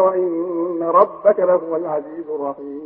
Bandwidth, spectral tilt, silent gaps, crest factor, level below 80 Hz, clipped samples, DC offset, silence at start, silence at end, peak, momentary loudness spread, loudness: 3.3 kHz; -12.5 dB/octave; none; 18 dB; -68 dBFS; under 0.1%; under 0.1%; 0 s; 0 s; -2 dBFS; 11 LU; -19 LUFS